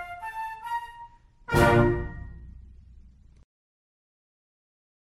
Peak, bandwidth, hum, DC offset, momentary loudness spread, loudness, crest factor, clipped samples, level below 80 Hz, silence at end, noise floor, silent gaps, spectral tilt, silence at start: -8 dBFS; 13 kHz; none; under 0.1%; 27 LU; -25 LUFS; 22 dB; under 0.1%; -42 dBFS; 2.5 s; -52 dBFS; none; -6.5 dB/octave; 0 s